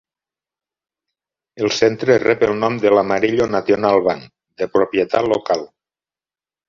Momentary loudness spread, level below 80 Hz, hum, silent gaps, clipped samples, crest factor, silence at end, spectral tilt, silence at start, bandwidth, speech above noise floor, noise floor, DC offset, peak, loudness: 7 LU; -54 dBFS; none; none; under 0.1%; 18 dB; 1.05 s; -5 dB/octave; 1.55 s; 7.4 kHz; over 74 dB; under -90 dBFS; under 0.1%; -2 dBFS; -17 LUFS